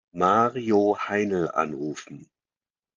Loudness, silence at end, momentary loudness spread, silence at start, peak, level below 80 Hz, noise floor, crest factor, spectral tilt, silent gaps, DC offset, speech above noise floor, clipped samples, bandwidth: -24 LUFS; 0.7 s; 13 LU; 0.15 s; -6 dBFS; -68 dBFS; under -90 dBFS; 18 dB; -6 dB/octave; none; under 0.1%; over 66 dB; under 0.1%; 7.6 kHz